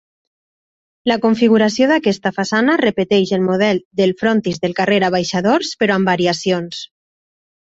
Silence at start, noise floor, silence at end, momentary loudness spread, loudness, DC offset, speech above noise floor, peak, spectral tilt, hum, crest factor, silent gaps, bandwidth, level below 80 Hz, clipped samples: 1.05 s; under -90 dBFS; 0.9 s; 6 LU; -16 LUFS; under 0.1%; over 75 dB; -2 dBFS; -5.5 dB/octave; none; 14 dB; 3.85-3.91 s; 8 kHz; -56 dBFS; under 0.1%